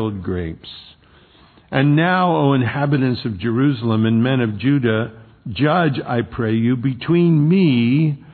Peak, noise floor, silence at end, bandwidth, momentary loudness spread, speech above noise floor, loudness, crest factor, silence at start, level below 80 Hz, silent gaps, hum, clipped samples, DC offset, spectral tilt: -2 dBFS; -49 dBFS; 0 s; 4.5 kHz; 11 LU; 32 dB; -17 LUFS; 16 dB; 0 s; -50 dBFS; none; none; under 0.1%; under 0.1%; -11 dB/octave